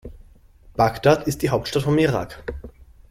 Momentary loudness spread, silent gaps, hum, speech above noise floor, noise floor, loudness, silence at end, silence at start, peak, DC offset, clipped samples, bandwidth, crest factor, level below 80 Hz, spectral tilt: 16 LU; none; none; 29 dB; -49 dBFS; -20 LUFS; 0.4 s; 0.05 s; -2 dBFS; under 0.1%; under 0.1%; 16 kHz; 20 dB; -42 dBFS; -6 dB/octave